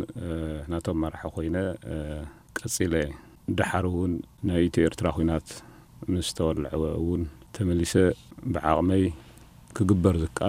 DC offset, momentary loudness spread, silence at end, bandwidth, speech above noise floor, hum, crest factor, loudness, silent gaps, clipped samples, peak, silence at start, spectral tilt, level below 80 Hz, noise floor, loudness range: under 0.1%; 13 LU; 0 s; 16 kHz; 24 dB; none; 22 dB; -27 LUFS; none; under 0.1%; -6 dBFS; 0 s; -6 dB/octave; -42 dBFS; -50 dBFS; 4 LU